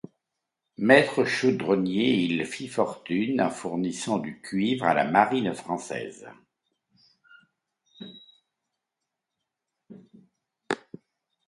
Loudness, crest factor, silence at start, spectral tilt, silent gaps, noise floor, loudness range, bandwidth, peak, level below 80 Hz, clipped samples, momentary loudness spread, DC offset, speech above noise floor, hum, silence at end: -25 LUFS; 24 dB; 0.8 s; -5 dB/octave; none; -85 dBFS; 18 LU; 11.5 kHz; -4 dBFS; -68 dBFS; under 0.1%; 15 LU; under 0.1%; 60 dB; none; 0.7 s